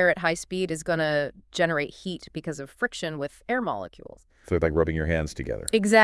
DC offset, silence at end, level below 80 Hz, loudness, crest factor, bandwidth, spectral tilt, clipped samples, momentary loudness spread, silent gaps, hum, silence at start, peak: under 0.1%; 0 s; -46 dBFS; -27 LUFS; 22 dB; 12 kHz; -5 dB/octave; under 0.1%; 11 LU; none; none; 0 s; -4 dBFS